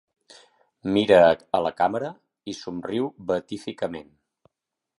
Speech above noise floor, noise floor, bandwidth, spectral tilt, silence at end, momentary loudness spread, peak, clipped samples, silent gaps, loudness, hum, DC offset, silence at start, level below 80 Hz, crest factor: 62 dB; -85 dBFS; 11.5 kHz; -6 dB/octave; 0.95 s; 19 LU; -2 dBFS; under 0.1%; none; -23 LUFS; none; under 0.1%; 0.85 s; -58 dBFS; 22 dB